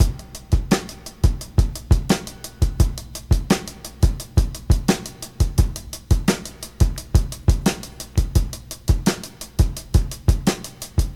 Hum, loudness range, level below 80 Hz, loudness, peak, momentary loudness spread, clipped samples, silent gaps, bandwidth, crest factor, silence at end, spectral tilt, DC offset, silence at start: none; 1 LU; -24 dBFS; -22 LUFS; -2 dBFS; 10 LU; under 0.1%; none; 17 kHz; 18 dB; 0 s; -5.5 dB/octave; under 0.1%; 0 s